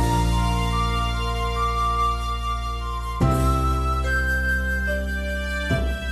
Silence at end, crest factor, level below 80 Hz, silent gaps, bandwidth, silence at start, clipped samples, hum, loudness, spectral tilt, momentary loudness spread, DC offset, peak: 0 s; 12 dB; -26 dBFS; none; 13.5 kHz; 0 s; under 0.1%; none; -23 LUFS; -5.5 dB/octave; 5 LU; under 0.1%; -10 dBFS